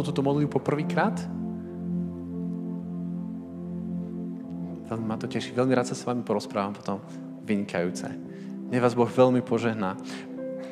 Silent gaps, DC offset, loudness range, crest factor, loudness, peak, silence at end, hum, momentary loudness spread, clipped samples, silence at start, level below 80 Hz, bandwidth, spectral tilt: none; under 0.1%; 7 LU; 20 dB; -29 LUFS; -8 dBFS; 0 s; none; 13 LU; under 0.1%; 0 s; -68 dBFS; 12.5 kHz; -7 dB/octave